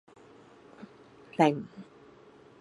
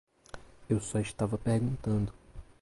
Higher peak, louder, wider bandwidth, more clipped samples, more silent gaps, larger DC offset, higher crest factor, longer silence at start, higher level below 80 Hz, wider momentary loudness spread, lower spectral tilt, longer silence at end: first, -8 dBFS vs -16 dBFS; first, -28 LUFS vs -32 LUFS; about the same, 11.5 kHz vs 11.5 kHz; neither; neither; neither; first, 26 dB vs 16 dB; first, 0.8 s vs 0.35 s; second, -76 dBFS vs -50 dBFS; first, 25 LU vs 21 LU; about the same, -6.5 dB/octave vs -7 dB/octave; first, 0.75 s vs 0.2 s